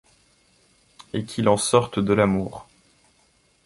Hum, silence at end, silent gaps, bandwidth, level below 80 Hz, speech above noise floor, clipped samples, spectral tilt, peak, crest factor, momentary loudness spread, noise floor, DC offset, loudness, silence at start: none; 1.05 s; none; 11.5 kHz; -52 dBFS; 41 dB; under 0.1%; -5 dB/octave; -2 dBFS; 22 dB; 14 LU; -62 dBFS; under 0.1%; -22 LUFS; 1.15 s